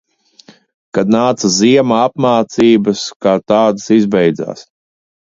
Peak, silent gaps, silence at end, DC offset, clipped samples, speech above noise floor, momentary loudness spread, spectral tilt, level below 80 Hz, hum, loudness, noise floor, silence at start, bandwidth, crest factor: 0 dBFS; 3.16-3.20 s; 0.6 s; under 0.1%; under 0.1%; 33 dB; 8 LU; -5 dB/octave; -54 dBFS; none; -12 LUFS; -45 dBFS; 0.95 s; 7.8 kHz; 14 dB